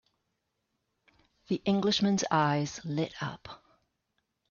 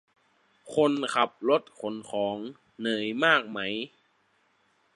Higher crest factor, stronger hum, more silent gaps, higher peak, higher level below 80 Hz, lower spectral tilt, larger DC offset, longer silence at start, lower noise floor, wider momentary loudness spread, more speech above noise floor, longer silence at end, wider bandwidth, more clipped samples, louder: about the same, 20 dB vs 24 dB; neither; neither; second, -12 dBFS vs -6 dBFS; first, -68 dBFS vs -76 dBFS; about the same, -5 dB/octave vs -4.5 dB/octave; neither; first, 1.5 s vs 0.65 s; first, -81 dBFS vs -69 dBFS; about the same, 12 LU vs 14 LU; first, 52 dB vs 41 dB; second, 0.95 s vs 1.1 s; second, 7.2 kHz vs 11.5 kHz; neither; about the same, -30 LUFS vs -28 LUFS